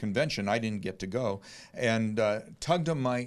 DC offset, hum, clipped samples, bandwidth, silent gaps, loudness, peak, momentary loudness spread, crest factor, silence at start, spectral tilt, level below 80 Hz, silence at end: under 0.1%; none; under 0.1%; 13 kHz; none; -30 LUFS; -12 dBFS; 7 LU; 18 dB; 0 s; -5.5 dB/octave; -60 dBFS; 0 s